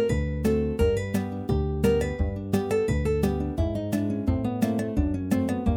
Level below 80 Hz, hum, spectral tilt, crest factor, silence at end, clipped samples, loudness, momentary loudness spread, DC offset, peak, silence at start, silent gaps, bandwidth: -34 dBFS; none; -7.5 dB/octave; 16 dB; 0 s; under 0.1%; -26 LUFS; 4 LU; under 0.1%; -10 dBFS; 0 s; none; 18 kHz